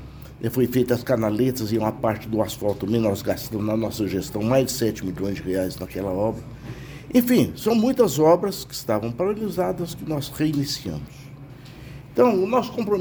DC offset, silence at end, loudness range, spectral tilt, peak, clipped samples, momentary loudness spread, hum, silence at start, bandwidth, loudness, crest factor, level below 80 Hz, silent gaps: under 0.1%; 0 s; 4 LU; -6 dB/octave; -4 dBFS; under 0.1%; 17 LU; none; 0 s; over 20 kHz; -23 LUFS; 18 dB; -48 dBFS; none